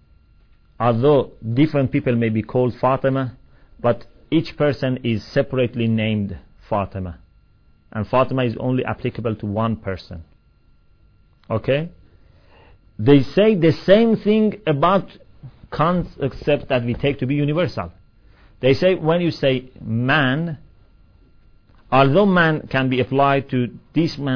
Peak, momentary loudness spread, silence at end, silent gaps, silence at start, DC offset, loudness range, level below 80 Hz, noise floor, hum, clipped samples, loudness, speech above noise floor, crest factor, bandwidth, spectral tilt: 0 dBFS; 12 LU; 0 s; none; 0.8 s; under 0.1%; 6 LU; -46 dBFS; -54 dBFS; none; under 0.1%; -19 LUFS; 36 dB; 20 dB; 5.4 kHz; -8.5 dB/octave